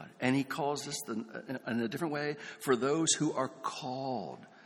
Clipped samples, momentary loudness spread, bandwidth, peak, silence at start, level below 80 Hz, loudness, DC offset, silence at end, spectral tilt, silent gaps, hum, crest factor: under 0.1%; 11 LU; 18 kHz; -14 dBFS; 0 s; -76 dBFS; -34 LUFS; under 0.1%; 0 s; -4 dB/octave; none; none; 20 dB